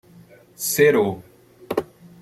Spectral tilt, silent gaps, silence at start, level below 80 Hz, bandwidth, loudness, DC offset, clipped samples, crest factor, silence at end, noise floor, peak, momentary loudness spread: -4 dB/octave; none; 0.6 s; -60 dBFS; 15.5 kHz; -21 LUFS; under 0.1%; under 0.1%; 18 dB; 0.4 s; -49 dBFS; -4 dBFS; 12 LU